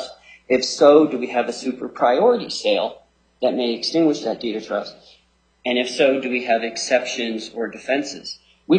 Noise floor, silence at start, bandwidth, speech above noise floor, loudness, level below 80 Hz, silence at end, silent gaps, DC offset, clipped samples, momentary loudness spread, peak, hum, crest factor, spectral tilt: -60 dBFS; 0 s; 9.4 kHz; 40 dB; -20 LUFS; -64 dBFS; 0 s; none; under 0.1%; under 0.1%; 13 LU; 0 dBFS; none; 20 dB; -4 dB/octave